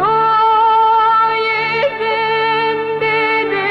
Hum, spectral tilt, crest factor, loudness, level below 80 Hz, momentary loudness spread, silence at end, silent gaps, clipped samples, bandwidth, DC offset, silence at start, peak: 50 Hz at -50 dBFS; -5.5 dB/octave; 8 dB; -13 LUFS; -54 dBFS; 5 LU; 0 s; none; under 0.1%; 6 kHz; under 0.1%; 0 s; -6 dBFS